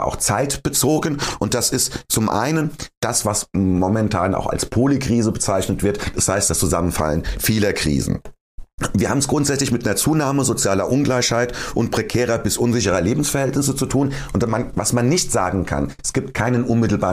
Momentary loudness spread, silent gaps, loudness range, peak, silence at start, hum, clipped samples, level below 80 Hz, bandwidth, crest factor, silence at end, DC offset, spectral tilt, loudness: 5 LU; 2.97-3.01 s, 8.41-8.58 s, 8.73-8.78 s; 1 LU; -4 dBFS; 0 s; none; under 0.1%; -36 dBFS; 15.5 kHz; 14 dB; 0 s; under 0.1%; -4.5 dB/octave; -19 LUFS